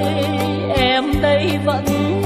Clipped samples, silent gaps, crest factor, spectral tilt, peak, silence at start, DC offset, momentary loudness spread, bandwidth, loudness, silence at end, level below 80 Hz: under 0.1%; none; 14 dB; -6 dB/octave; -2 dBFS; 0 s; under 0.1%; 3 LU; 15 kHz; -17 LUFS; 0 s; -34 dBFS